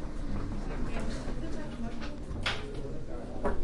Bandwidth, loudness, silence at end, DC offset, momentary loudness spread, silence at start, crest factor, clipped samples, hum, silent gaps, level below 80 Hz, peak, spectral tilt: 11 kHz; -38 LUFS; 0 s; under 0.1%; 7 LU; 0 s; 14 dB; under 0.1%; none; none; -36 dBFS; -18 dBFS; -5.5 dB/octave